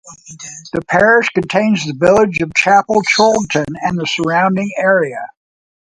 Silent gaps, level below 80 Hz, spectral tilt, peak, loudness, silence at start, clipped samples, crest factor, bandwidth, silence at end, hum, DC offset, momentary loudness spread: none; -48 dBFS; -4.5 dB/octave; 0 dBFS; -13 LUFS; 0.05 s; under 0.1%; 14 dB; 11 kHz; 0.6 s; none; under 0.1%; 13 LU